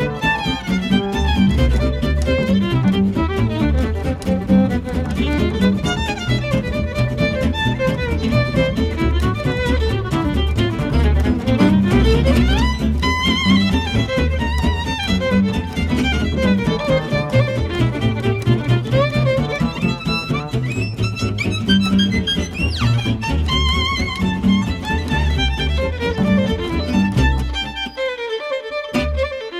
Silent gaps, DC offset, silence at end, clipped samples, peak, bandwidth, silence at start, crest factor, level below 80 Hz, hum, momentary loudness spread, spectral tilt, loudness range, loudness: none; under 0.1%; 0 s; under 0.1%; -4 dBFS; 13.5 kHz; 0 s; 14 dB; -24 dBFS; none; 6 LU; -6.5 dB/octave; 3 LU; -18 LUFS